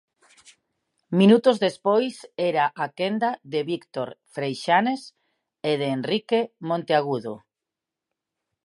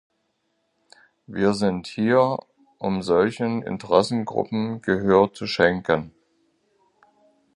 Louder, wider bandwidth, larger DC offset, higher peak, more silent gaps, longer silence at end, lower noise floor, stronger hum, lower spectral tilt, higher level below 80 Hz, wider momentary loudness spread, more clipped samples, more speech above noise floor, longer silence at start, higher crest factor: about the same, -24 LUFS vs -22 LUFS; about the same, 11.5 kHz vs 11 kHz; neither; about the same, -4 dBFS vs -2 dBFS; neither; second, 1.3 s vs 1.45 s; first, -87 dBFS vs -72 dBFS; neither; about the same, -6.5 dB/octave vs -6.5 dB/octave; second, -78 dBFS vs -54 dBFS; first, 13 LU vs 9 LU; neither; first, 64 dB vs 51 dB; second, 1.1 s vs 1.3 s; about the same, 20 dB vs 22 dB